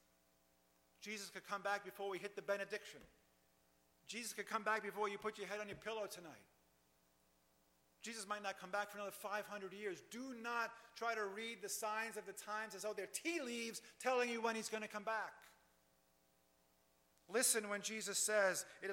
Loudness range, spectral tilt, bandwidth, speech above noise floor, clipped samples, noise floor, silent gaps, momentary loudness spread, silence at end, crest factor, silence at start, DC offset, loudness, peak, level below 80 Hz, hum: 6 LU; -1.5 dB/octave; 16.5 kHz; 33 dB; under 0.1%; -77 dBFS; none; 13 LU; 0 s; 22 dB; 1 s; under 0.1%; -43 LUFS; -22 dBFS; -86 dBFS; none